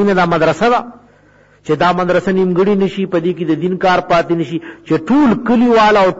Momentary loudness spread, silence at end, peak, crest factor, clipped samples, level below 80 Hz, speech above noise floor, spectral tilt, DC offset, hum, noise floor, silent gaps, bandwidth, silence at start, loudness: 8 LU; 0 s; -4 dBFS; 10 dB; under 0.1%; -44 dBFS; 35 dB; -7 dB/octave; 0.7%; 50 Hz at -50 dBFS; -48 dBFS; none; 8 kHz; 0 s; -13 LUFS